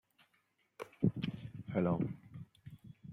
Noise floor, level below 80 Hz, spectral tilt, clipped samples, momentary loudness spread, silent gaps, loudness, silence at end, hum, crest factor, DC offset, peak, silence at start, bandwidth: -77 dBFS; -68 dBFS; -9 dB/octave; under 0.1%; 20 LU; none; -38 LUFS; 0 s; none; 22 dB; under 0.1%; -18 dBFS; 0.8 s; 11.5 kHz